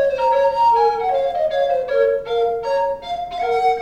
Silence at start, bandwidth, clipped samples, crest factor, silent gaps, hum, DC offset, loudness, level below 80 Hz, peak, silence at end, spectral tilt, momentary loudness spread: 0 s; 8.8 kHz; under 0.1%; 12 dB; none; none; under 0.1%; -18 LUFS; -50 dBFS; -6 dBFS; 0 s; -3.5 dB/octave; 7 LU